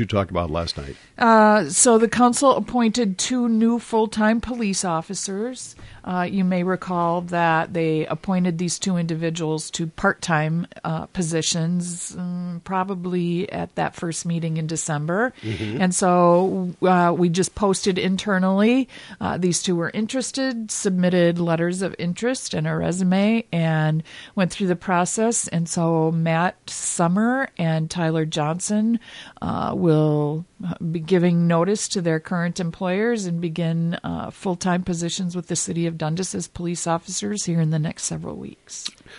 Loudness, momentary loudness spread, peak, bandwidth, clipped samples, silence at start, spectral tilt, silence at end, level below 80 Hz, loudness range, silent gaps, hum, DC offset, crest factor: -22 LUFS; 10 LU; -4 dBFS; 11.5 kHz; under 0.1%; 0 s; -5 dB/octave; 0 s; -50 dBFS; 6 LU; none; none; under 0.1%; 18 dB